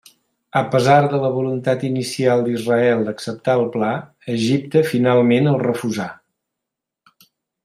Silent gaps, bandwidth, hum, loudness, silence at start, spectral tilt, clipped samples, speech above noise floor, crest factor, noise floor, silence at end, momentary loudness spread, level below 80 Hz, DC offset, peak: none; 15 kHz; none; -18 LUFS; 0.55 s; -6.5 dB/octave; under 0.1%; 66 dB; 16 dB; -83 dBFS; 1.5 s; 10 LU; -62 dBFS; under 0.1%; -2 dBFS